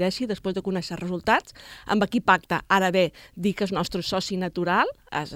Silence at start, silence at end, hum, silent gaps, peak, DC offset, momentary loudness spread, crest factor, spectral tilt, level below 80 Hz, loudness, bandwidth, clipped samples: 0 s; 0 s; none; none; -4 dBFS; under 0.1%; 8 LU; 20 dB; -5 dB/octave; -52 dBFS; -25 LUFS; 16 kHz; under 0.1%